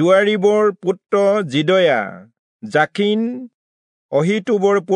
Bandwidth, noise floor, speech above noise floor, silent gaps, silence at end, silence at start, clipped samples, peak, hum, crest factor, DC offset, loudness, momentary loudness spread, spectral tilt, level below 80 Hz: 10 kHz; under -90 dBFS; over 74 dB; 2.39-2.59 s, 3.54-4.09 s; 0 s; 0 s; under 0.1%; -2 dBFS; none; 14 dB; under 0.1%; -17 LUFS; 9 LU; -6 dB/octave; -74 dBFS